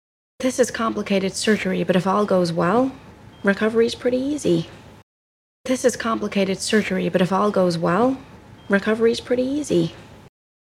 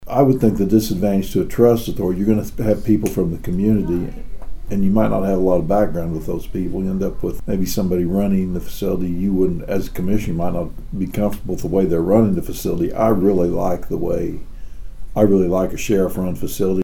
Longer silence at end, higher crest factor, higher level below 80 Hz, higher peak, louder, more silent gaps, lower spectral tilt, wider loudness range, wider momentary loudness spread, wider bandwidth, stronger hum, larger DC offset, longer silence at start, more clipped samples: first, 0.45 s vs 0 s; about the same, 18 dB vs 16 dB; second, -56 dBFS vs -32 dBFS; second, -4 dBFS vs 0 dBFS; about the same, -21 LUFS vs -19 LUFS; first, 5.03-5.64 s vs none; second, -5 dB/octave vs -7.5 dB/octave; about the same, 2 LU vs 3 LU; second, 5 LU vs 9 LU; second, 14.5 kHz vs 18 kHz; neither; neither; first, 0.4 s vs 0 s; neither